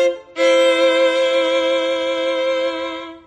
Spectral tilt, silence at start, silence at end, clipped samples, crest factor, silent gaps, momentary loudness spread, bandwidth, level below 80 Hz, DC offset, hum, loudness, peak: -1.5 dB/octave; 0 s; 0.1 s; under 0.1%; 12 dB; none; 7 LU; 9.6 kHz; -62 dBFS; under 0.1%; none; -17 LUFS; -4 dBFS